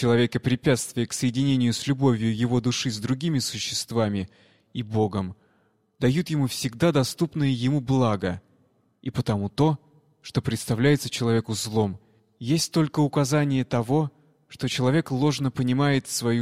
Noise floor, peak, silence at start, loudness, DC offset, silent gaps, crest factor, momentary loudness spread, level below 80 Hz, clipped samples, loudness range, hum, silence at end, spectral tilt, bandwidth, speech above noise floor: -66 dBFS; -8 dBFS; 0 s; -25 LUFS; under 0.1%; none; 16 dB; 9 LU; -56 dBFS; under 0.1%; 3 LU; none; 0 s; -5.5 dB/octave; 15.5 kHz; 42 dB